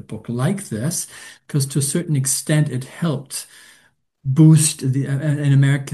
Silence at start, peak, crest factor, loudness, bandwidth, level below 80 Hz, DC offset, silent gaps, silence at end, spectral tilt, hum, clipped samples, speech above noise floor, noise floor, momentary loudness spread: 0.1 s; -2 dBFS; 16 dB; -18 LUFS; 12.5 kHz; -60 dBFS; under 0.1%; none; 0 s; -5.5 dB/octave; none; under 0.1%; 39 dB; -58 dBFS; 16 LU